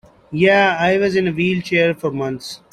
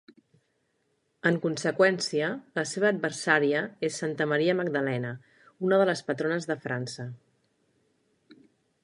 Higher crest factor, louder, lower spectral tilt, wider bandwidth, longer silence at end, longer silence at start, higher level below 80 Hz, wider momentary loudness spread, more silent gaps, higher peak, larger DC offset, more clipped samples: second, 16 dB vs 22 dB; first, -17 LUFS vs -27 LUFS; about the same, -6 dB/octave vs -5 dB/octave; first, 13 kHz vs 11.5 kHz; second, 0.15 s vs 1.7 s; second, 0.3 s vs 1.25 s; first, -54 dBFS vs -78 dBFS; about the same, 12 LU vs 10 LU; neither; first, -2 dBFS vs -6 dBFS; neither; neither